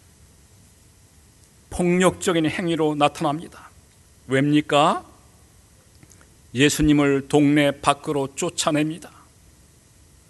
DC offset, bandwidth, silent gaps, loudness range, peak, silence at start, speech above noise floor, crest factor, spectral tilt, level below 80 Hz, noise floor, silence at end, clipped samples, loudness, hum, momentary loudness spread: under 0.1%; 12 kHz; none; 3 LU; 0 dBFS; 1.7 s; 33 dB; 22 dB; -5 dB/octave; -46 dBFS; -53 dBFS; 1.2 s; under 0.1%; -21 LUFS; none; 10 LU